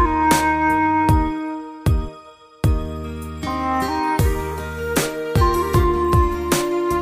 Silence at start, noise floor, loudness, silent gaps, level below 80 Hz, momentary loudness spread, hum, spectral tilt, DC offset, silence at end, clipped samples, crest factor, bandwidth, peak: 0 s; -43 dBFS; -20 LUFS; none; -26 dBFS; 11 LU; none; -5.5 dB/octave; under 0.1%; 0 s; under 0.1%; 16 dB; 16 kHz; -2 dBFS